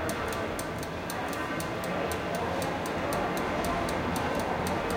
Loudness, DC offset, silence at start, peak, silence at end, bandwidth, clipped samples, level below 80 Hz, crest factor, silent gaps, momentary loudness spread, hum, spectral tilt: -31 LUFS; under 0.1%; 0 s; -16 dBFS; 0 s; 17 kHz; under 0.1%; -48 dBFS; 14 dB; none; 4 LU; none; -4.5 dB/octave